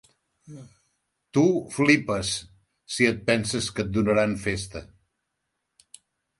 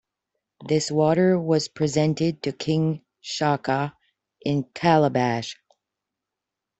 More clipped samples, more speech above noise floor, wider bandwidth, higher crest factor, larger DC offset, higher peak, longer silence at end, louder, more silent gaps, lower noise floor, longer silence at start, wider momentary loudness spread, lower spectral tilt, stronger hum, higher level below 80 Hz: neither; second, 56 dB vs 63 dB; first, 11.5 kHz vs 8.2 kHz; about the same, 24 dB vs 20 dB; neither; about the same, -4 dBFS vs -4 dBFS; first, 1.55 s vs 1.25 s; about the same, -24 LUFS vs -23 LUFS; neither; second, -80 dBFS vs -86 dBFS; about the same, 0.5 s vs 0.6 s; about the same, 15 LU vs 13 LU; second, -4.5 dB/octave vs -6 dB/octave; neither; first, -52 dBFS vs -62 dBFS